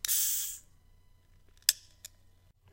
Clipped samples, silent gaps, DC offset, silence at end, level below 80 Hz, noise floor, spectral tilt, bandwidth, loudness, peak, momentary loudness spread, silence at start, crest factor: under 0.1%; none; under 0.1%; 0.95 s; -64 dBFS; -63 dBFS; 3.5 dB/octave; 16.5 kHz; -30 LUFS; 0 dBFS; 25 LU; 0.05 s; 36 dB